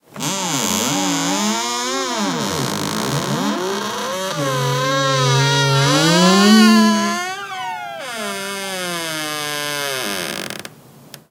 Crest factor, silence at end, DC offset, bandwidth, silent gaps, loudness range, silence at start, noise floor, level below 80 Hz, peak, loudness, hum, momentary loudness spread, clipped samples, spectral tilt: 18 dB; 0.1 s; under 0.1%; 18.5 kHz; none; 9 LU; 0.15 s; -42 dBFS; -60 dBFS; 0 dBFS; -17 LUFS; none; 13 LU; under 0.1%; -4 dB/octave